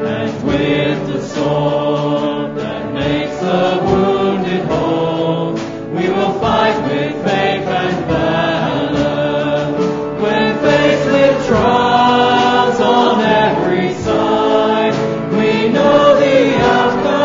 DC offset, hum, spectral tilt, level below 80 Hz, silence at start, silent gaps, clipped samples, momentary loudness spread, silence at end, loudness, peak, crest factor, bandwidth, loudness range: under 0.1%; none; -6 dB/octave; -40 dBFS; 0 s; none; under 0.1%; 7 LU; 0 s; -14 LUFS; 0 dBFS; 12 dB; 7.6 kHz; 4 LU